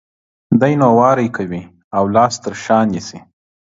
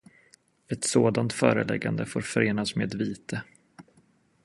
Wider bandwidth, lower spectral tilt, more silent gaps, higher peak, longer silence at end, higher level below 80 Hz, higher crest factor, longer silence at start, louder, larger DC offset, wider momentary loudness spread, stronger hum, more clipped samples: second, 7.8 kHz vs 11.5 kHz; first, -6.5 dB/octave vs -5 dB/octave; first, 1.84-1.91 s vs none; first, 0 dBFS vs -4 dBFS; about the same, 0.6 s vs 0.6 s; first, -50 dBFS vs -62 dBFS; second, 16 dB vs 24 dB; second, 0.5 s vs 0.7 s; first, -15 LUFS vs -27 LUFS; neither; about the same, 14 LU vs 12 LU; neither; neither